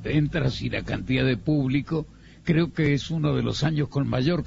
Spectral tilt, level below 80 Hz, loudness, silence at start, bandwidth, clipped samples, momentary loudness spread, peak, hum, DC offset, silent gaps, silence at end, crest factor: -7 dB/octave; -42 dBFS; -25 LUFS; 0 s; 7.8 kHz; under 0.1%; 6 LU; -8 dBFS; none; under 0.1%; none; 0 s; 16 dB